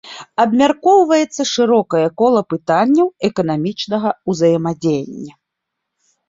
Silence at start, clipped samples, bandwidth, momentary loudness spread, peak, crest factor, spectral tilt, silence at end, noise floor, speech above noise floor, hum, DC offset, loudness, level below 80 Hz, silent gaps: 0.05 s; under 0.1%; 7.8 kHz; 8 LU; -2 dBFS; 14 dB; -5.5 dB/octave; 1 s; -78 dBFS; 63 dB; none; under 0.1%; -15 LUFS; -58 dBFS; none